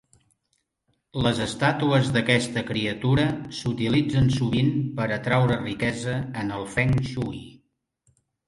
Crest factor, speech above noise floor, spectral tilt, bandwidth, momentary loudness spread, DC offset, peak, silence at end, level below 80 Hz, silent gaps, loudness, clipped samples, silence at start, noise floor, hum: 18 dB; 51 dB; -6 dB/octave; 11.5 kHz; 9 LU; under 0.1%; -6 dBFS; 0.95 s; -48 dBFS; none; -24 LUFS; under 0.1%; 1.15 s; -74 dBFS; none